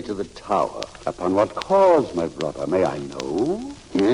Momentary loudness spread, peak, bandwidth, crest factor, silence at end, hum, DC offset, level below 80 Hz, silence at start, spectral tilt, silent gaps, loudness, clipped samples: 13 LU; -6 dBFS; 11 kHz; 16 dB; 0 s; none; under 0.1%; -50 dBFS; 0 s; -6 dB/octave; none; -22 LUFS; under 0.1%